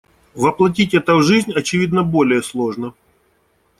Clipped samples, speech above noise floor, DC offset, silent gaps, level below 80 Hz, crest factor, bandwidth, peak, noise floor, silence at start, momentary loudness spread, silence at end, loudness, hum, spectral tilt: under 0.1%; 45 dB; under 0.1%; none; -52 dBFS; 16 dB; 14 kHz; -2 dBFS; -60 dBFS; 0.35 s; 9 LU; 0.9 s; -16 LUFS; none; -5.5 dB/octave